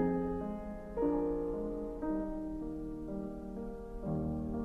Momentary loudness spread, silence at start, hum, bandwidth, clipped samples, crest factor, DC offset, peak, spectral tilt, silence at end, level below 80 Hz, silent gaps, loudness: 9 LU; 0 s; none; 6.6 kHz; under 0.1%; 16 dB; under 0.1%; -20 dBFS; -10 dB/octave; 0 s; -48 dBFS; none; -38 LUFS